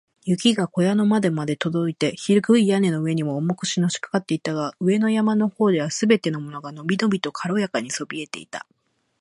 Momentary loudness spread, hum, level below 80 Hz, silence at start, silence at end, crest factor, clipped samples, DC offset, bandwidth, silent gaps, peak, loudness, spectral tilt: 11 LU; none; -68 dBFS; 0.25 s; 0.6 s; 18 dB; under 0.1%; under 0.1%; 11.5 kHz; none; -4 dBFS; -22 LUFS; -5.5 dB/octave